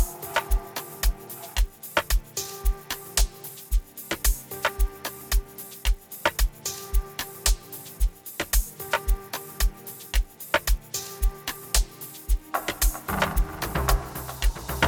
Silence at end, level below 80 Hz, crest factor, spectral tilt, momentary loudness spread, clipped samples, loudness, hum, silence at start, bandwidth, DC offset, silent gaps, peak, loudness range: 0 s; -28 dBFS; 22 dB; -3 dB/octave; 8 LU; under 0.1%; -28 LUFS; none; 0 s; 19 kHz; under 0.1%; none; -6 dBFS; 2 LU